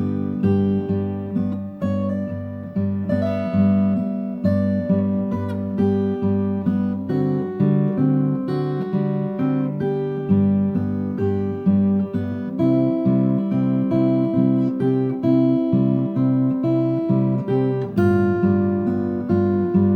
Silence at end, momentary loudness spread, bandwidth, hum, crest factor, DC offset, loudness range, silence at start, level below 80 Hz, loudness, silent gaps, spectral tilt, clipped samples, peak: 0 s; 6 LU; 4.7 kHz; none; 12 dB; under 0.1%; 3 LU; 0 s; -58 dBFS; -20 LUFS; none; -11 dB/octave; under 0.1%; -6 dBFS